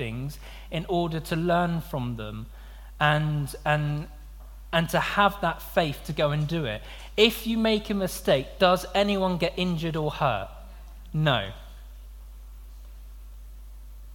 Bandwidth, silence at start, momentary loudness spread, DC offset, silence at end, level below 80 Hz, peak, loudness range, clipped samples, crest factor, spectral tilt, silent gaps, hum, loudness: 17.5 kHz; 0 s; 24 LU; under 0.1%; 0 s; -42 dBFS; -4 dBFS; 6 LU; under 0.1%; 22 dB; -5.5 dB/octave; none; none; -26 LUFS